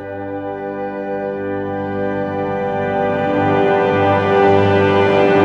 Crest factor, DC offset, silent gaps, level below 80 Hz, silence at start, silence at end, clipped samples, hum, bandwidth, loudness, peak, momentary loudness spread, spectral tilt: 14 dB; under 0.1%; none; -50 dBFS; 0 s; 0 s; under 0.1%; 50 Hz at -40 dBFS; 7.4 kHz; -17 LUFS; -2 dBFS; 12 LU; -8 dB/octave